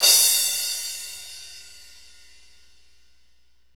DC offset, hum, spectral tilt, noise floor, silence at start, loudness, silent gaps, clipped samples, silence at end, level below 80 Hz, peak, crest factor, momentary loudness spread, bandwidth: 0.4%; none; 4 dB/octave; -66 dBFS; 0 s; -19 LUFS; none; under 0.1%; 2.15 s; -64 dBFS; -4 dBFS; 22 dB; 26 LU; over 20 kHz